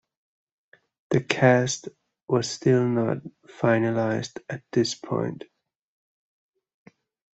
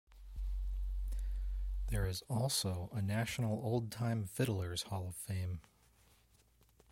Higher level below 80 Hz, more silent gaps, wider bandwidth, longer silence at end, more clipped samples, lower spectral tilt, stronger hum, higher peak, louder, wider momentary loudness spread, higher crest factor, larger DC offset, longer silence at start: second, -66 dBFS vs -44 dBFS; neither; second, 8.2 kHz vs 16.5 kHz; first, 1.95 s vs 1.3 s; neither; about the same, -5.5 dB/octave vs -5 dB/octave; neither; first, -2 dBFS vs -22 dBFS; first, -24 LUFS vs -39 LUFS; first, 14 LU vs 7 LU; first, 26 dB vs 18 dB; neither; first, 1.1 s vs 0.1 s